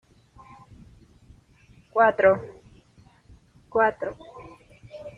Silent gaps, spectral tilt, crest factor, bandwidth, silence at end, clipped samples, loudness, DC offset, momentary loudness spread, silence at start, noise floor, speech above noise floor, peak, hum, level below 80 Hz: none; -7 dB/octave; 22 dB; 7 kHz; 0.05 s; under 0.1%; -23 LUFS; under 0.1%; 26 LU; 1.95 s; -56 dBFS; 35 dB; -6 dBFS; none; -58 dBFS